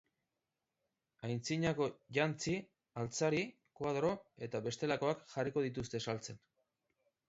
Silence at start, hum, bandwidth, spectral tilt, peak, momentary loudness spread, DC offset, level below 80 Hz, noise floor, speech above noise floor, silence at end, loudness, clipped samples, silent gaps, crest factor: 1.2 s; none; 7.6 kHz; -5 dB/octave; -20 dBFS; 9 LU; under 0.1%; -70 dBFS; -89 dBFS; 52 dB; 0.9 s; -39 LUFS; under 0.1%; none; 20 dB